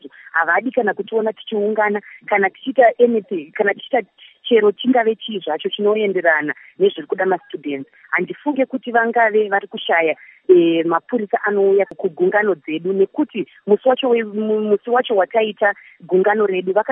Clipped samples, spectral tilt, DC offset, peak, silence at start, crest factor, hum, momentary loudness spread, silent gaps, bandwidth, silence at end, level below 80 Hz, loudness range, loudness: under 0.1%; -9.5 dB/octave; under 0.1%; -2 dBFS; 0.05 s; 16 dB; none; 8 LU; none; 3.7 kHz; 0 s; -76 dBFS; 2 LU; -18 LUFS